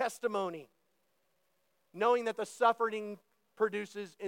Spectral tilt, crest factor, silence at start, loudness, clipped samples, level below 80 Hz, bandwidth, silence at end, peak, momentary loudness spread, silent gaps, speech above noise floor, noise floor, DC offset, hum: -4 dB/octave; 20 dB; 0 s; -33 LUFS; under 0.1%; under -90 dBFS; 16.5 kHz; 0 s; -14 dBFS; 15 LU; none; 45 dB; -78 dBFS; under 0.1%; none